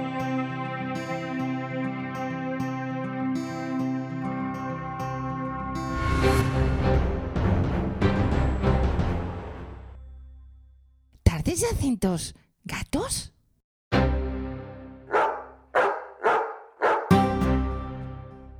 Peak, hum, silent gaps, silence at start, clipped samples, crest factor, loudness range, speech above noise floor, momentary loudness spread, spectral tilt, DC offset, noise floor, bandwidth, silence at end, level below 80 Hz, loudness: -4 dBFS; none; 13.64-13.91 s; 0 s; under 0.1%; 22 dB; 5 LU; 32 dB; 13 LU; -6 dB/octave; under 0.1%; -57 dBFS; 16 kHz; 0 s; -34 dBFS; -27 LUFS